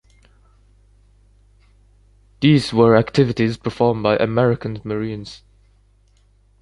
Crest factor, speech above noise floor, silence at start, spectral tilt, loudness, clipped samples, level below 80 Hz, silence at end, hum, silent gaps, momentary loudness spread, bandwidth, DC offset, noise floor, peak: 18 dB; 38 dB; 2.4 s; -7.5 dB/octave; -18 LUFS; under 0.1%; -48 dBFS; 1.25 s; 50 Hz at -40 dBFS; none; 12 LU; 11.5 kHz; under 0.1%; -55 dBFS; -2 dBFS